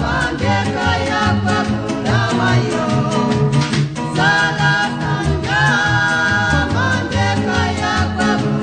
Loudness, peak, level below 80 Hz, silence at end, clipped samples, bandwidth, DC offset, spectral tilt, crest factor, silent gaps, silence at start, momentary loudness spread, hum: -16 LUFS; -2 dBFS; -34 dBFS; 0 s; under 0.1%; 9.6 kHz; under 0.1%; -5.5 dB/octave; 14 dB; none; 0 s; 4 LU; none